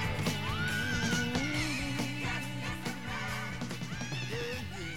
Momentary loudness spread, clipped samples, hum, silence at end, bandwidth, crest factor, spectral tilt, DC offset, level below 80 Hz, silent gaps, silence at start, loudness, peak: 7 LU; under 0.1%; none; 0 s; 18 kHz; 18 dB; -4 dB/octave; 0.5%; -50 dBFS; none; 0 s; -34 LUFS; -16 dBFS